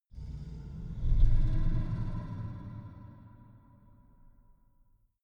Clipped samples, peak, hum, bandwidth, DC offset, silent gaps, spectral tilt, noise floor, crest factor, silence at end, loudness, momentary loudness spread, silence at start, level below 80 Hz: under 0.1%; -12 dBFS; none; 3.9 kHz; under 0.1%; none; -9.5 dB/octave; -66 dBFS; 20 dB; 1.95 s; -36 LUFS; 22 LU; 0.15 s; -32 dBFS